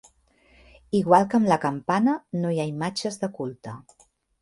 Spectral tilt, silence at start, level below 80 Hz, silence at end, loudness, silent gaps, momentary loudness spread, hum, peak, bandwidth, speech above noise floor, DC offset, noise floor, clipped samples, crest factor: -6 dB/octave; 0.95 s; -62 dBFS; 0.6 s; -24 LUFS; none; 15 LU; none; -2 dBFS; 11.5 kHz; 37 dB; under 0.1%; -60 dBFS; under 0.1%; 22 dB